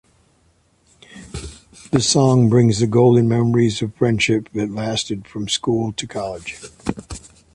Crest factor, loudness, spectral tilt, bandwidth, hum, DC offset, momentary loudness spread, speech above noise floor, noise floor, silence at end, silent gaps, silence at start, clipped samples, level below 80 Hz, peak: 16 dB; -18 LUFS; -5.5 dB/octave; 11.5 kHz; none; under 0.1%; 20 LU; 42 dB; -59 dBFS; 0.35 s; none; 1.15 s; under 0.1%; -46 dBFS; -4 dBFS